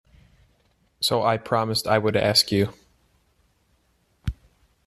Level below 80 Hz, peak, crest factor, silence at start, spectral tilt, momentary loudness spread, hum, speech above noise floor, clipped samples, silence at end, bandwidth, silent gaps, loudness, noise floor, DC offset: -48 dBFS; -4 dBFS; 22 dB; 1 s; -4 dB/octave; 16 LU; none; 44 dB; under 0.1%; 0.55 s; 14 kHz; none; -22 LUFS; -66 dBFS; under 0.1%